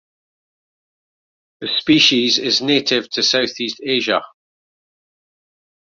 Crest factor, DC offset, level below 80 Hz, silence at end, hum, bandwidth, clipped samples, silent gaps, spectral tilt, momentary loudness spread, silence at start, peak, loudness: 20 dB; under 0.1%; -62 dBFS; 1.65 s; none; 7.6 kHz; under 0.1%; none; -2.5 dB/octave; 10 LU; 1.6 s; 0 dBFS; -16 LUFS